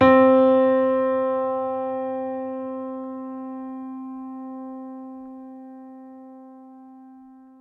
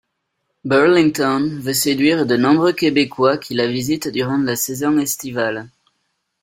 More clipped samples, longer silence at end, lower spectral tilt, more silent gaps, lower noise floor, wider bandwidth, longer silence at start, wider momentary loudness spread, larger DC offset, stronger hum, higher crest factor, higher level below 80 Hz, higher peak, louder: neither; second, 0.3 s vs 0.75 s; first, -8.5 dB/octave vs -4.5 dB/octave; neither; second, -47 dBFS vs -73 dBFS; second, 4.3 kHz vs 16.5 kHz; second, 0 s vs 0.65 s; first, 26 LU vs 8 LU; neither; neither; about the same, 20 dB vs 16 dB; second, -64 dBFS vs -58 dBFS; about the same, -4 dBFS vs -2 dBFS; second, -22 LUFS vs -17 LUFS